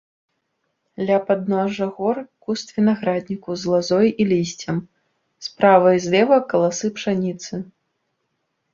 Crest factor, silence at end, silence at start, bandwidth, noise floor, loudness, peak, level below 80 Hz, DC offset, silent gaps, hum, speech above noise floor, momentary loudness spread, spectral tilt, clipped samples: 18 dB; 1.1 s; 1 s; 7.6 kHz; -73 dBFS; -20 LUFS; -2 dBFS; -62 dBFS; under 0.1%; none; none; 54 dB; 13 LU; -5.5 dB/octave; under 0.1%